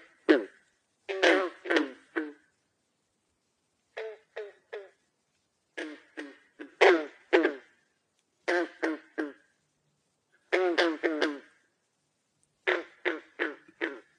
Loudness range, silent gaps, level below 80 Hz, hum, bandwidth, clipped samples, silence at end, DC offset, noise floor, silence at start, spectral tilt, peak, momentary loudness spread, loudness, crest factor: 16 LU; none; -86 dBFS; none; 10 kHz; under 0.1%; 0.2 s; under 0.1%; -77 dBFS; 0.3 s; -2 dB/octave; -8 dBFS; 21 LU; -29 LUFS; 24 dB